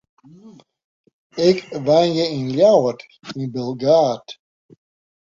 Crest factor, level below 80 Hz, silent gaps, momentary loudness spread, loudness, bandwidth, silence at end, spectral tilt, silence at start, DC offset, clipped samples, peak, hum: 18 dB; -62 dBFS; 0.84-1.04 s, 1.13-1.30 s; 19 LU; -18 LUFS; 7.6 kHz; 0.9 s; -6 dB/octave; 0.45 s; under 0.1%; under 0.1%; -2 dBFS; none